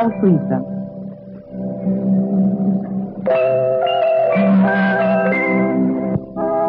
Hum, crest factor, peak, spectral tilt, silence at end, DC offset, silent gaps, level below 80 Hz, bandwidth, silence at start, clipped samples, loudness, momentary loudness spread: none; 14 dB; -2 dBFS; -10.5 dB/octave; 0 s; under 0.1%; none; -52 dBFS; 4.6 kHz; 0 s; under 0.1%; -17 LUFS; 13 LU